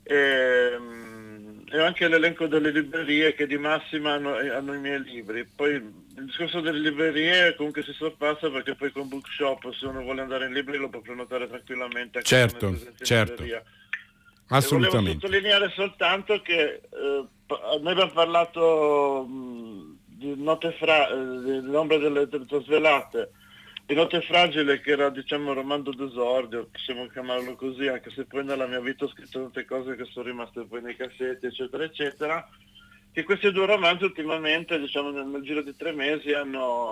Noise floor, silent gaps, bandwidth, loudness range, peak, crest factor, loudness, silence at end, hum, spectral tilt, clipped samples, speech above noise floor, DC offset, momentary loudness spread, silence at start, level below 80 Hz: -55 dBFS; none; 16 kHz; 8 LU; -8 dBFS; 18 dB; -25 LUFS; 0 s; none; -4.5 dB/octave; under 0.1%; 29 dB; under 0.1%; 15 LU; 0.05 s; -56 dBFS